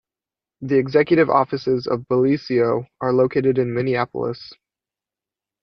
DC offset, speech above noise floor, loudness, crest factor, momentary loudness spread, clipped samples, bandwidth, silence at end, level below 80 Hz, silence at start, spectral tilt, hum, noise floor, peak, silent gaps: under 0.1%; 71 dB; -20 LUFS; 18 dB; 9 LU; under 0.1%; 6.2 kHz; 1.1 s; -58 dBFS; 0.6 s; -8.5 dB/octave; none; -90 dBFS; -2 dBFS; none